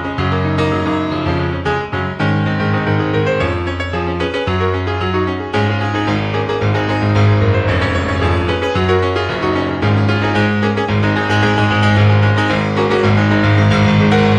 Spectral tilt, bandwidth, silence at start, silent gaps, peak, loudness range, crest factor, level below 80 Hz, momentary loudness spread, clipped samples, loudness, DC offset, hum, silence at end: -7 dB/octave; 8.6 kHz; 0 s; none; -2 dBFS; 4 LU; 14 dB; -36 dBFS; 6 LU; under 0.1%; -15 LUFS; under 0.1%; none; 0 s